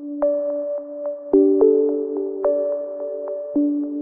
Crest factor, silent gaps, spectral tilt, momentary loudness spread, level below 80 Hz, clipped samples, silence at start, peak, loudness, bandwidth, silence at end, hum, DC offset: 16 dB; none; -12.5 dB/octave; 13 LU; -60 dBFS; under 0.1%; 0 s; -4 dBFS; -21 LUFS; 2 kHz; 0 s; none; under 0.1%